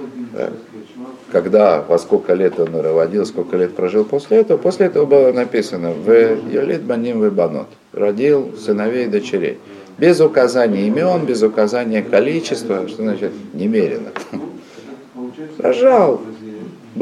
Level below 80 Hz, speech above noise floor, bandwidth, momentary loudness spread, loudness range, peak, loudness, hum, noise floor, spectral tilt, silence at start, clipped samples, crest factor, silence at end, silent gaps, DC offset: -66 dBFS; 21 dB; 11.5 kHz; 19 LU; 4 LU; -2 dBFS; -16 LUFS; none; -36 dBFS; -6.5 dB/octave; 0 s; under 0.1%; 14 dB; 0 s; none; under 0.1%